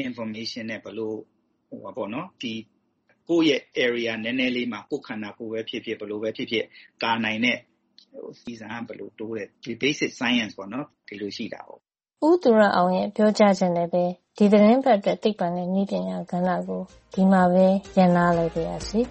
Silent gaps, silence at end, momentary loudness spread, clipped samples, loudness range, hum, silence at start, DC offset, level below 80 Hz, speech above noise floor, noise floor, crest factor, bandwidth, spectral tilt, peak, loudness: none; 0 s; 17 LU; under 0.1%; 8 LU; none; 0 s; under 0.1%; -56 dBFS; 43 dB; -67 dBFS; 18 dB; 8.4 kHz; -6 dB/octave; -6 dBFS; -23 LUFS